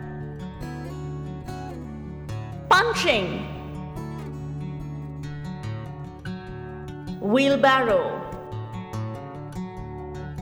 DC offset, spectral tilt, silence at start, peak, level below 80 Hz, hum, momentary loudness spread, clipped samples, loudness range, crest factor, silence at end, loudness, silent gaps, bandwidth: under 0.1%; -5.5 dB/octave; 0 s; -6 dBFS; -46 dBFS; none; 17 LU; under 0.1%; 10 LU; 20 dB; 0 s; -27 LUFS; none; 19.5 kHz